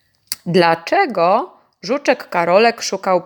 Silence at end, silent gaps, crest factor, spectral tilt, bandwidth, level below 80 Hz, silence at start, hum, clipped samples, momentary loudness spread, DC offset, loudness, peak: 0 s; none; 16 dB; -4.5 dB/octave; over 20 kHz; -70 dBFS; 0.3 s; none; under 0.1%; 13 LU; under 0.1%; -16 LUFS; 0 dBFS